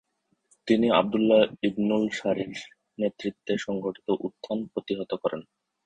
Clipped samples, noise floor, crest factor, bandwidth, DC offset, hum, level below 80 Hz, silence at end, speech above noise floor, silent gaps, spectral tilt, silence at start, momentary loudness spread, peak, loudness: under 0.1%; -68 dBFS; 20 dB; 9 kHz; under 0.1%; none; -64 dBFS; 0.45 s; 42 dB; none; -6 dB/octave; 0.65 s; 13 LU; -6 dBFS; -27 LUFS